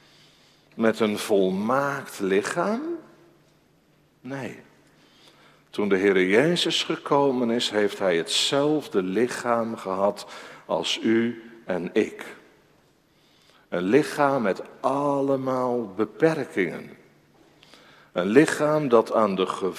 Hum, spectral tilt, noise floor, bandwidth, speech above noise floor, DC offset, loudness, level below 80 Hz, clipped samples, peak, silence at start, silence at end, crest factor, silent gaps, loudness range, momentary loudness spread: none; -4.5 dB/octave; -61 dBFS; 15.5 kHz; 38 dB; under 0.1%; -24 LUFS; -68 dBFS; under 0.1%; -4 dBFS; 0.75 s; 0 s; 20 dB; none; 6 LU; 14 LU